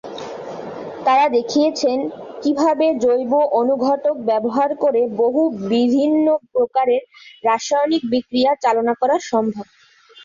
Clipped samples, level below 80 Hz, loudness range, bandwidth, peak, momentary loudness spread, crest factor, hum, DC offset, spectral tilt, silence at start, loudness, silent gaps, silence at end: under 0.1%; -64 dBFS; 1 LU; 7.4 kHz; -4 dBFS; 9 LU; 14 dB; none; under 0.1%; -4.5 dB/octave; 0.05 s; -18 LUFS; none; 0 s